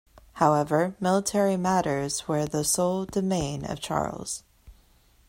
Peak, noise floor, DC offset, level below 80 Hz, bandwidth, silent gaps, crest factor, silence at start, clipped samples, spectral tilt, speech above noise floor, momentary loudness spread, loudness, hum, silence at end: -8 dBFS; -60 dBFS; under 0.1%; -52 dBFS; 16 kHz; none; 20 dB; 0.35 s; under 0.1%; -4.5 dB/octave; 34 dB; 8 LU; -26 LUFS; none; 0.55 s